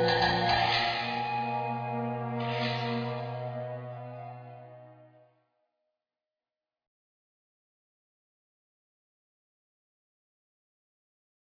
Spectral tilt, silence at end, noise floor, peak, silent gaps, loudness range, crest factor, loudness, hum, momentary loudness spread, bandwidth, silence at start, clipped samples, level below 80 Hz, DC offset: -6 dB/octave; 6.35 s; under -90 dBFS; -14 dBFS; none; 19 LU; 22 dB; -30 LUFS; none; 19 LU; 5.4 kHz; 0 s; under 0.1%; -60 dBFS; under 0.1%